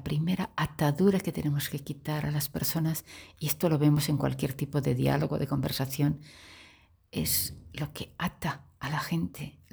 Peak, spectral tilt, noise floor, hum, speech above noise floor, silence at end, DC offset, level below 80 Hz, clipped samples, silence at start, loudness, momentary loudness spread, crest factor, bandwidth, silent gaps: -12 dBFS; -5.5 dB/octave; -59 dBFS; none; 29 dB; 0.2 s; under 0.1%; -54 dBFS; under 0.1%; 0 s; -30 LUFS; 12 LU; 18 dB; over 20 kHz; none